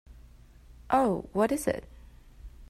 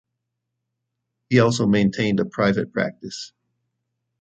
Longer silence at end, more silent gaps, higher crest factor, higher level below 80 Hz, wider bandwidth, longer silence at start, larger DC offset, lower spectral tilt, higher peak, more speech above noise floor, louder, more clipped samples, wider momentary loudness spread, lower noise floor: second, 0.05 s vs 0.95 s; neither; about the same, 22 dB vs 20 dB; first, -50 dBFS vs -56 dBFS; first, 16 kHz vs 9 kHz; second, 0.1 s vs 1.3 s; neither; about the same, -5.5 dB/octave vs -6 dB/octave; second, -10 dBFS vs -2 dBFS; second, 26 dB vs 60 dB; second, -28 LUFS vs -20 LUFS; neither; second, 7 LU vs 15 LU; second, -53 dBFS vs -80 dBFS